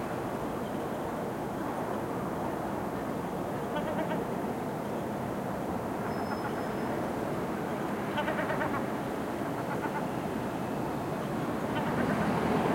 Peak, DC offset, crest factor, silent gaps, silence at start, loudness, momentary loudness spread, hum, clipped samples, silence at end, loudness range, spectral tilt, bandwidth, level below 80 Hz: -16 dBFS; under 0.1%; 16 dB; none; 0 s; -33 LUFS; 4 LU; none; under 0.1%; 0 s; 1 LU; -6.5 dB/octave; 16.5 kHz; -56 dBFS